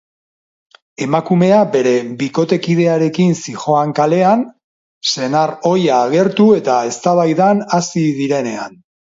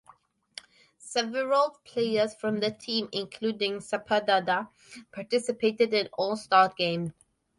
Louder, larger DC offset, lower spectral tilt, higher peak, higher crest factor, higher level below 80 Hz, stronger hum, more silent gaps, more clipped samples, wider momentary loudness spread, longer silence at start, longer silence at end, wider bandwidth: first, -14 LUFS vs -27 LUFS; neither; first, -6 dB/octave vs -4 dB/octave; first, 0 dBFS vs -8 dBFS; second, 14 dB vs 20 dB; first, -62 dBFS vs -72 dBFS; neither; first, 4.64-5.01 s vs none; neither; second, 8 LU vs 16 LU; about the same, 1 s vs 1.05 s; about the same, 0.5 s vs 0.45 s; second, 7.8 kHz vs 11.5 kHz